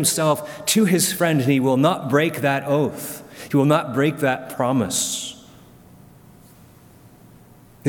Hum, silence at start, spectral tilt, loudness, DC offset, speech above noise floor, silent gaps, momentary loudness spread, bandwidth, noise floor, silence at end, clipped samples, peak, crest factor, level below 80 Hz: none; 0 s; -4.5 dB/octave; -20 LUFS; under 0.1%; 28 dB; none; 8 LU; 19 kHz; -48 dBFS; 0 s; under 0.1%; -2 dBFS; 18 dB; -60 dBFS